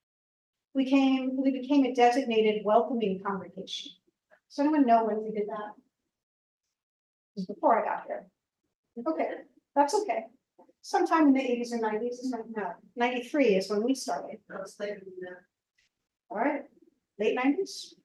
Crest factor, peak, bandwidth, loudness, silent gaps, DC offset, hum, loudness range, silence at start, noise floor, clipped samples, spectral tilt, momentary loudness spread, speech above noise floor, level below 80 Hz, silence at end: 20 dB; -10 dBFS; 12.5 kHz; -28 LUFS; 6.23-6.60 s, 6.83-7.35 s, 8.75-8.84 s; under 0.1%; none; 7 LU; 0.75 s; -67 dBFS; under 0.1%; -5 dB/octave; 17 LU; 39 dB; -80 dBFS; 0.15 s